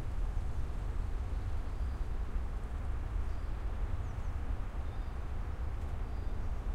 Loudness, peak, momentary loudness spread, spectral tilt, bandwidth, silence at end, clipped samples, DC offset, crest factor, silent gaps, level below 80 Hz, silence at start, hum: -41 LUFS; -22 dBFS; 2 LU; -7.5 dB/octave; 9.8 kHz; 0 s; under 0.1%; under 0.1%; 12 dB; none; -36 dBFS; 0 s; none